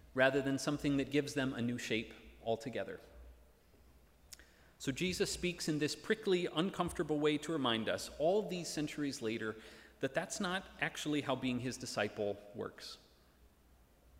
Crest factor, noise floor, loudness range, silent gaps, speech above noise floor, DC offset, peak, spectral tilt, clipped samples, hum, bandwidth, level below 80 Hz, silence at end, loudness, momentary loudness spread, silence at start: 22 dB; -66 dBFS; 6 LU; none; 29 dB; under 0.1%; -16 dBFS; -4.5 dB/octave; under 0.1%; none; 16 kHz; -64 dBFS; 1.25 s; -37 LUFS; 12 LU; 0.05 s